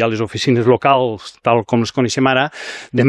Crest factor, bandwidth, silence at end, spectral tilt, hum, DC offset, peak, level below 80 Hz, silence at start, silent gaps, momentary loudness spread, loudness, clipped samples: 16 dB; 11.5 kHz; 0 s; -5.5 dB/octave; none; under 0.1%; 0 dBFS; -52 dBFS; 0 s; none; 9 LU; -16 LUFS; under 0.1%